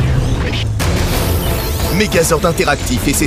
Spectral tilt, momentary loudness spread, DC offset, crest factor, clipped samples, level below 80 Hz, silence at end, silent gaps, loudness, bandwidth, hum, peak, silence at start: -4.5 dB/octave; 5 LU; under 0.1%; 14 dB; under 0.1%; -22 dBFS; 0 s; none; -15 LUFS; 16 kHz; none; 0 dBFS; 0 s